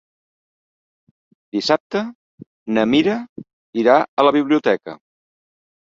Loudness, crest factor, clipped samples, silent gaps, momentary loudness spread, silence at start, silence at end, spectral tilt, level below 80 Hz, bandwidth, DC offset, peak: -18 LUFS; 20 dB; under 0.1%; 1.80-1.90 s, 2.15-2.38 s, 2.47-2.66 s, 3.29-3.36 s, 3.53-3.73 s, 4.08-4.17 s; 16 LU; 1.55 s; 1 s; -5.5 dB/octave; -62 dBFS; 7.6 kHz; under 0.1%; 0 dBFS